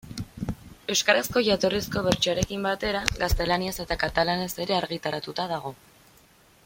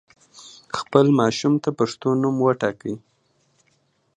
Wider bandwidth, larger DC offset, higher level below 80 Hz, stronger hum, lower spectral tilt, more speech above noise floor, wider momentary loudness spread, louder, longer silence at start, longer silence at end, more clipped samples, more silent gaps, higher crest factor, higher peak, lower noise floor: first, 16.5 kHz vs 9.8 kHz; neither; first, -40 dBFS vs -64 dBFS; neither; second, -3.5 dB/octave vs -6.5 dB/octave; second, 31 dB vs 45 dB; about the same, 13 LU vs 14 LU; second, -26 LUFS vs -21 LUFS; second, 0.05 s vs 0.4 s; second, 0.9 s vs 1.2 s; neither; neither; about the same, 26 dB vs 22 dB; about the same, 0 dBFS vs 0 dBFS; second, -57 dBFS vs -65 dBFS